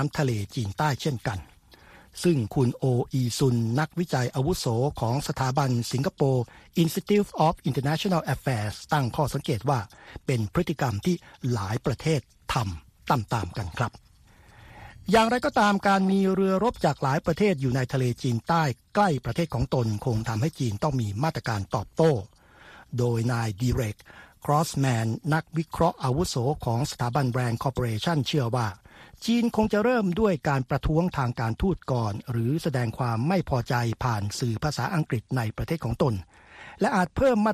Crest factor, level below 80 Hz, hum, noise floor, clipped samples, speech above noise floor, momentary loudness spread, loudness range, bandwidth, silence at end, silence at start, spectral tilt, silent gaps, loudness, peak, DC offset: 18 dB; -46 dBFS; none; -55 dBFS; under 0.1%; 29 dB; 7 LU; 4 LU; 14.5 kHz; 0 s; 0 s; -6.5 dB/octave; none; -26 LUFS; -6 dBFS; under 0.1%